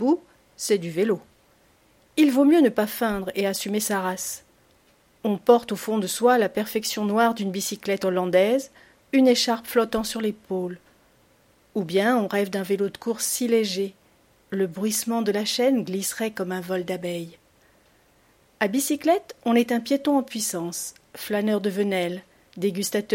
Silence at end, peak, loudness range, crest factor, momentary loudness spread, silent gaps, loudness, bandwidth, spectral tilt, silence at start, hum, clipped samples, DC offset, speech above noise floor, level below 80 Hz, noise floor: 0 s; -4 dBFS; 4 LU; 20 dB; 11 LU; none; -24 LUFS; 16.5 kHz; -4 dB/octave; 0 s; none; under 0.1%; under 0.1%; 37 dB; -62 dBFS; -60 dBFS